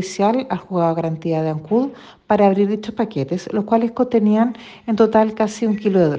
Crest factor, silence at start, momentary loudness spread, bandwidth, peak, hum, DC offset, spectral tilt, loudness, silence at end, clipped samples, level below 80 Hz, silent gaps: 16 dB; 0 s; 8 LU; 8.8 kHz; -2 dBFS; none; under 0.1%; -7 dB/octave; -19 LUFS; 0 s; under 0.1%; -58 dBFS; none